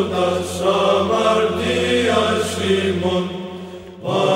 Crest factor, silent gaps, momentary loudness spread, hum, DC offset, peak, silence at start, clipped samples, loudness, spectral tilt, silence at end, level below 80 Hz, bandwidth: 16 dB; none; 14 LU; none; under 0.1%; -2 dBFS; 0 s; under 0.1%; -18 LUFS; -5 dB/octave; 0 s; -50 dBFS; 16 kHz